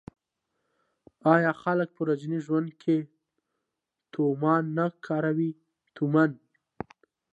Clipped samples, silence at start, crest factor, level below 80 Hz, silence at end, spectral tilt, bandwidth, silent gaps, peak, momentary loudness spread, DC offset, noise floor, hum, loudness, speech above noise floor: under 0.1%; 1.25 s; 22 dB; -72 dBFS; 1 s; -9 dB/octave; 7.8 kHz; none; -6 dBFS; 17 LU; under 0.1%; -85 dBFS; none; -27 LUFS; 60 dB